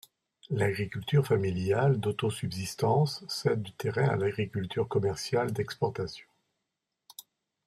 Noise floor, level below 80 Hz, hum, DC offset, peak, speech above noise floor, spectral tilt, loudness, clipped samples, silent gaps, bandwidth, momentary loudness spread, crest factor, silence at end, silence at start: -85 dBFS; -64 dBFS; none; under 0.1%; -14 dBFS; 56 dB; -6 dB/octave; -30 LUFS; under 0.1%; none; 14.5 kHz; 11 LU; 16 dB; 0.45 s; 0.45 s